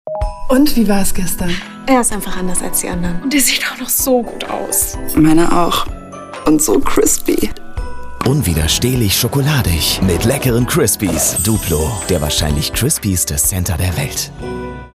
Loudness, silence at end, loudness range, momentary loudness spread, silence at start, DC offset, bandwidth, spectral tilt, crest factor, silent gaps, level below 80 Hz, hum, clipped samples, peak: -15 LUFS; 0.1 s; 2 LU; 10 LU; 0.05 s; under 0.1%; 15.5 kHz; -4 dB/octave; 14 dB; none; -26 dBFS; none; under 0.1%; 0 dBFS